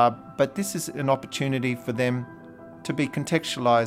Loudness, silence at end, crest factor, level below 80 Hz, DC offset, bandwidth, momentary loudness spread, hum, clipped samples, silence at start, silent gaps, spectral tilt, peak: -26 LUFS; 0 s; 18 dB; -64 dBFS; under 0.1%; 16.5 kHz; 12 LU; none; under 0.1%; 0 s; none; -5 dB/octave; -8 dBFS